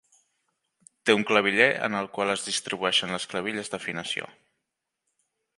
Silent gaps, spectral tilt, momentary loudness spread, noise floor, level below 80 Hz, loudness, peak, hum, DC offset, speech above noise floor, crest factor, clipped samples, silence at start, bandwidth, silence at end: none; -2.5 dB/octave; 11 LU; -83 dBFS; -70 dBFS; -25 LUFS; -4 dBFS; none; under 0.1%; 57 dB; 24 dB; under 0.1%; 1.05 s; 11.5 kHz; 1.3 s